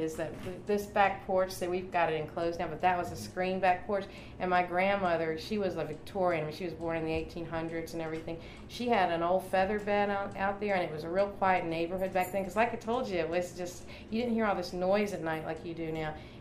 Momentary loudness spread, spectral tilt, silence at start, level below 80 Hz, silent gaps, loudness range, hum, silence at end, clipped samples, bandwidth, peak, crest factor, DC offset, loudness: 9 LU; -5.5 dB/octave; 0 s; -54 dBFS; none; 3 LU; none; 0 s; under 0.1%; 15.5 kHz; -12 dBFS; 20 dB; under 0.1%; -32 LUFS